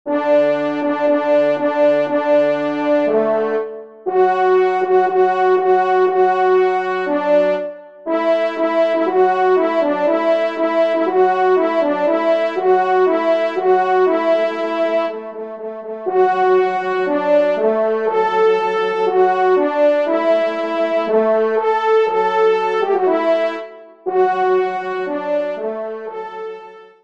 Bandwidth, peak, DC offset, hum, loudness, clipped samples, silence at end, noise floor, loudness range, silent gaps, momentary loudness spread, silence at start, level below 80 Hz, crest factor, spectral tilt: 7.4 kHz; -4 dBFS; 0.2%; none; -16 LUFS; under 0.1%; 0.2 s; -37 dBFS; 2 LU; none; 9 LU; 0.05 s; -70 dBFS; 12 dB; -6 dB/octave